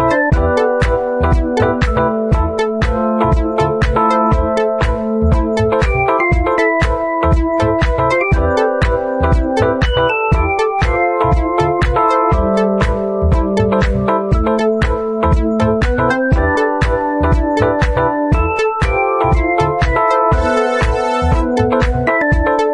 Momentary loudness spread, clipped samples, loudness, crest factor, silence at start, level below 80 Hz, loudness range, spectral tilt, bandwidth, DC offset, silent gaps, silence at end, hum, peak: 2 LU; under 0.1%; -14 LUFS; 12 dB; 0 s; -20 dBFS; 1 LU; -7.5 dB/octave; 10.5 kHz; under 0.1%; none; 0 s; none; -2 dBFS